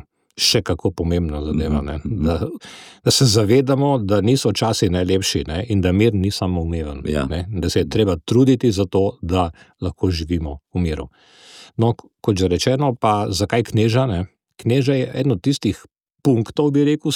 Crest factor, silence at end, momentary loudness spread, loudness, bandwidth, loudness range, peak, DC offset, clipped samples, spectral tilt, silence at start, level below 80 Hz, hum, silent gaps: 14 dB; 0 s; 10 LU; -19 LUFS; 17.5 kHz; 4 LU; -4 dBFS; under 0.1%; under 0.1%; -5.5 dB/octave; 0.35 s; -36 dBFS; none; none